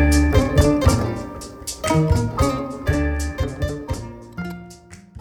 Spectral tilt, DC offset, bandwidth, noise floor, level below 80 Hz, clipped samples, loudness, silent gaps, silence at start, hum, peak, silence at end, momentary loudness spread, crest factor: -6 dB/octave; under 0.1%; 17.5 kHz; -43 dBFS; -26 dBFS; under 0.1%; -21 LUFS; none; 0 s; none; -4 dBFS; 0 s; 16 LU; 16 dB